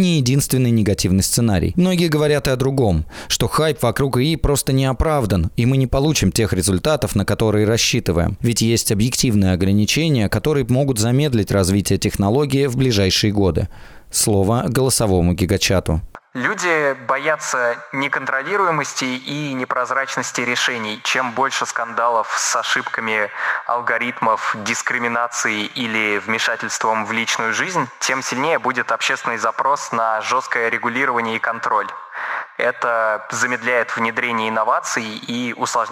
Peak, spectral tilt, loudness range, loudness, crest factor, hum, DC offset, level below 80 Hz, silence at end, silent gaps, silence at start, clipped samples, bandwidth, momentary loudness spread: -6 dBFS; -4.5 dB/octave; 3 LU; -18 LUFS; 12 dB; none; under 0.1%; -38 dBFS; 0 s; none; 0 s; under 0.1%; over 20 kHz; 5 LU